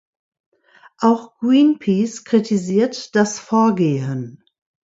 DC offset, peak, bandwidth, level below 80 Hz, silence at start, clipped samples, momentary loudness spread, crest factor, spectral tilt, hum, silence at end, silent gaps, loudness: under 0.1%; -2 dBFS; 8 kHz; -66 dBFS; 1 s; under 0.1%; 8 LU; 16 dB; -6 dB/octave; none; 0.55 s; none; -18 LUFS